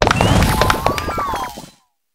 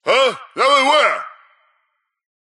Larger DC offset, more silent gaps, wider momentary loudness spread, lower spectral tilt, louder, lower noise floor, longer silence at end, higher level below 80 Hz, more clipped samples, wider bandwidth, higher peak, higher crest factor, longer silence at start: neither; neither; about the same, 13 LU vs 12 LU; first, -5 dB/octave vs -1 dB/octave; about the same, -16 LUFS vs -15 LUFS; second, -47 dBFS vs -70 dBFS; second, 0.45 s vs 1.15 s; first, -26 dBFS vs -84 dBFS; neither; first, 16.5 kHz vs 12 kHz; about the same, 0 dBFS vs -2 dBFS; about the same, 18 dB vs 16 dB; about the same, 0 s vs 0.05 s